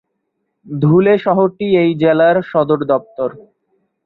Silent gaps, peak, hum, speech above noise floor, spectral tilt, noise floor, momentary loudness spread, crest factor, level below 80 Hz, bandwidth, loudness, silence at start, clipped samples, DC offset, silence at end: none; -2 dBFS; none; 58 dB; -10.5 dB/octave; -71 dBFS; 12 LU; 14 dB; -56 dBFS; 4.6 kHz; -14 LUFS; 0.65 s; under 0.1%; under 0.1%; 0.65 s